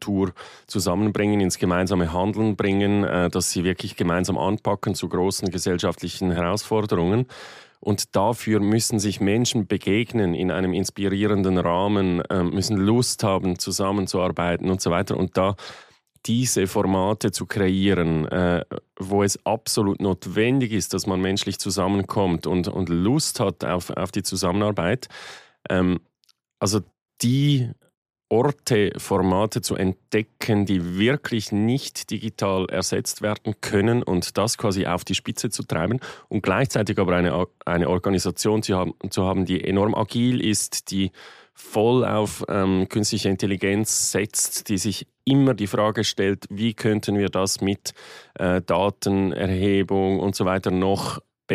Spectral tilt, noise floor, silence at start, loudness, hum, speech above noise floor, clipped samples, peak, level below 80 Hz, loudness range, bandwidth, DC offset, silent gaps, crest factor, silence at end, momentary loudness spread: -5 dB/octave; -65 dBFS; 0 s; -23 LUFS; none; 43 dB; under 0.1%; -8 dBFS; -50 dBFS; 2 LU; 15.5 kHz; under 0.1%; 27.02-27.06 s, 27.97-28.02 s; 14 dB; 0 s; 6 LU